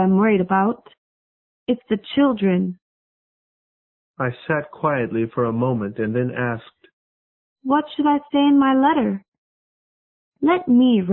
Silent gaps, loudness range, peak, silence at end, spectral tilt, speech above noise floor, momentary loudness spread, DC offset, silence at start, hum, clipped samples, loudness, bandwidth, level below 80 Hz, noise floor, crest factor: 0.98-1.66 s, 2.82-4.14 s, 6.93-7.56 s, 9.28-9.32 s, 9.38-10.32 s; 5 LU; -6 dBFS; 0 s; -12 dB/octave; over 71 dB; 11 LU; under 0.1%; 0 s; none; under 0.1%; -20 LUFS; 4.2 kHz; -58 dBFS; under -90 dBFS; 16 dB